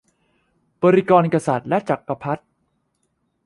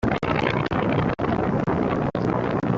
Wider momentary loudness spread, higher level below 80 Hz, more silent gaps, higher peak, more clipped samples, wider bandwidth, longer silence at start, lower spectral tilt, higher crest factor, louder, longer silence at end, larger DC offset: first, 12 LU vs 1 LU; second, -62 dBFS vs -42 dBFS; neither; first, -2 dBFS vs -6 dBFS; neither; first, 11.5 kHz vs 7.6 kHz; first, 0.8 s vs 0 s; about the same, -7.5 dB/octave vs -8 dB/octave; about the same, 20 dB vs 16 dB; first, -19 LUFS vs -23 LUFS; first, 1.1 s vs 0 s; neither